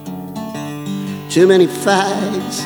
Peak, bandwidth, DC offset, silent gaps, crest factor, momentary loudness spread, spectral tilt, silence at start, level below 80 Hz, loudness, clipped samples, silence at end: 0 dBFS; over 20 kHz; under 0.1%; none; 16 dB; 15 LU; -5 dB/octave; 0 s; -56 dBFS; -16 LUFS; under 0.1%; 0 s